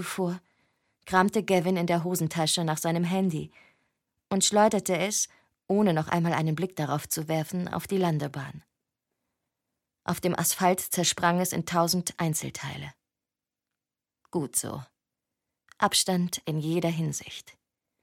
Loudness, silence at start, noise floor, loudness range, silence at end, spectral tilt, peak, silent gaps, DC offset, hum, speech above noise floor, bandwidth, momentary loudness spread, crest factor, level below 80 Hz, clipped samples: -27 LUFS; 0 s; -90 dBFS; 6 LU; 0.5 s; -4 dB/octave; -6 dBFS; none; under 0.1%; none; 63 dB; 17 kHz; 12 LU; 24 dB; -64 dBFS; under 0.1%